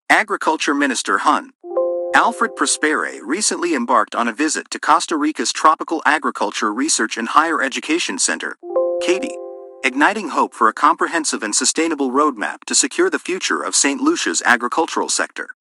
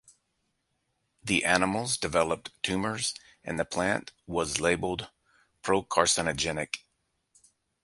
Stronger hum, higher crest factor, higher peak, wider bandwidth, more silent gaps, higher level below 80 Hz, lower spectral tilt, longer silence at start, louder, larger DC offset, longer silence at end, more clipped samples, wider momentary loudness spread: neither; second, 18 dB vs 24 dB; first, 0 dBFS vs -6 dBFS; about the same, 12 kHz vs 12 kHz; first, 1.55-1.59 s vs none; second, -70 dBFS vs -54 dBFS; second, -1 dB/octave vs -3 dB/octave; second, 0.1 s vs 1.25 s; first, -17 LUFS vs -28 LUFS; neither; second, 0.1 s vs 1.05 s; neither; second, 6 LU vs 12 LU